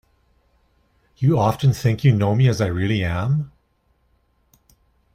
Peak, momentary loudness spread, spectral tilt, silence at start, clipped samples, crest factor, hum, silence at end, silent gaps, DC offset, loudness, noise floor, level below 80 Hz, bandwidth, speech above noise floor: -6 dBFS; 6 LU; -7.5 dB/octave; 1.2 s; under 0.1%; 16 dB; none; 1.65 s; none; under 0.1%; -19 LUFS; -64 dBFS; -48 dBFS; 14.5 kHz; 46 dB